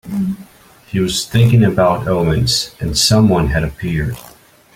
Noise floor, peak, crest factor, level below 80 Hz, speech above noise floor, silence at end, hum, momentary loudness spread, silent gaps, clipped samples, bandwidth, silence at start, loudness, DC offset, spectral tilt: -44 dBFS; 0 dBFS; 14 dB; -32 dBFS; 30 dB; 0.45 s; none; 12 LU; none; under 0.1%; 16.5 kHz; 0.05 s; -15 LUFS; under 0.1%; -5 dB/octave